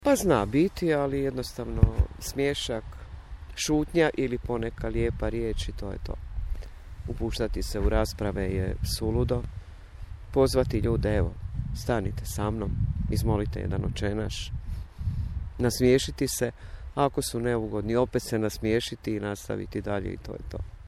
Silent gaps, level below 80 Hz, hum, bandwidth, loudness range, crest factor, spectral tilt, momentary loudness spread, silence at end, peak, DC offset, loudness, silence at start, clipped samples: none; -36 dBFS; none; 16 kHz; 4 LU; 22 dB; -6 dB/octave; 14 LU; 0 s; -4 dBFS; under 0.1%; -28 LUFS; 0 s; under 0.1%